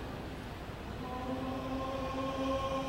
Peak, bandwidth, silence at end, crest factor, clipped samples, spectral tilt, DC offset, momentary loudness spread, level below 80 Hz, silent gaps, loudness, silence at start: -22 dBFS; 16 kHz; 0 s; 14 dB; under 0.1%; -6 dB/octave; under 0.1%; 9 LU; -48 dBFS; none; -38 LUFS; 0 s